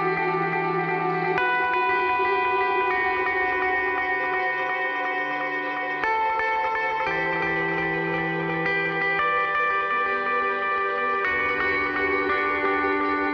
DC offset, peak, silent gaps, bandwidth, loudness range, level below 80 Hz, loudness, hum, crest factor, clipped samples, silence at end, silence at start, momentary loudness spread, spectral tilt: under 0.1%; -8 dBFS; none; 6.8 kHz; 2 LU; -56 dBFS; -23 LUFS; none; 16 dB; under 0.1%; 0 s; 0 s; 3 LU; -6.5 dB/octave